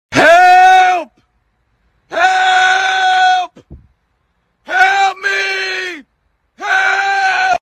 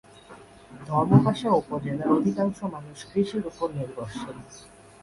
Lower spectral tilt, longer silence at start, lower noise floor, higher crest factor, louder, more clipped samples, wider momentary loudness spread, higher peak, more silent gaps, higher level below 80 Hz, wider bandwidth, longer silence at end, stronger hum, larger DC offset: second, -2 dB/octave vs -8 dB/octave; second, 0.1 s vs 0.3 s; first, -63 dBFS vs -48 dBFS; second, 12 dB vs 22 dB; first, -11 LUFS vs -25 LUFS; neither; second, 14 LU vs 20 LU; first, 0 dBFS vs -4 dBFS; neither; about the same, -52 dBFS vs -56 dBFS; first, 13 kHz vs 11.5 kHz; second, 0.05 s vs 0.35 s; neither; neither